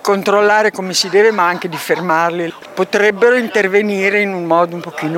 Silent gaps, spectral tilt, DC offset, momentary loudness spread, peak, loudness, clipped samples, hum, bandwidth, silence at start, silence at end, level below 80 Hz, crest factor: none; -4 dB/octave; under 0.1%; 9 LU; 0 dBFS; -14 LUFS; under 0.1%; none; 16.5 kHz; 0.05 s; 0 s; -68 dBFS; 14 dB